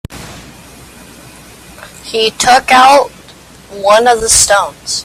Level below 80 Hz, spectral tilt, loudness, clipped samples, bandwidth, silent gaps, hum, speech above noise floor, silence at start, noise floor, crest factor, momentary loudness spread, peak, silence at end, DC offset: -40 dBFS; -1 dB/octave; -8 LUFS; 0.2%; over 20 kHz; none; none; 28 dB; 0.1 s; -37 dBFS; 12 dB; 24 LU; 0 dBFS; 0 s; under 0.1%